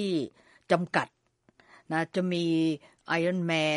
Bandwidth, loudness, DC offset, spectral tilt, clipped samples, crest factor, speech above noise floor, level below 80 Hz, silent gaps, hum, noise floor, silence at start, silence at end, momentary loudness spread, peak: 11.5 kHz; -29 LUFS; under 0.1%; -6 dB/octave; under 0.1%; 20 dB; 37 dB; -74 dBFS; none; none; -65 dBFS; 0 s; 0 s; 8 LU; -10 dBFS